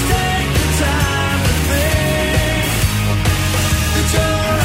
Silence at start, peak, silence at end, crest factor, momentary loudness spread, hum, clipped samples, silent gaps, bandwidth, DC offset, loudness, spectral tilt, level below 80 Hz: 0 s; -2 dBFS; 0 s; 14 dB; 1 LU; none; under 0.1%; none; 16.5 kHz; under 0.1%; -16 LUFS; -4.5 dB/octave; -22 dBFS